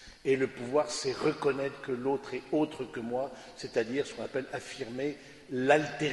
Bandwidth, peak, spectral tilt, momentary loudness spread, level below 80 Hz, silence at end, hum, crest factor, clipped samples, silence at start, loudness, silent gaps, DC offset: 11.5 kHz; -10 dBFS; -4.5 dB/octave; 12 LU; -66 dBFS; 0 s; none; 22 dB; under 0.1%; 0 s; -32 LUFS; none; under 0.1%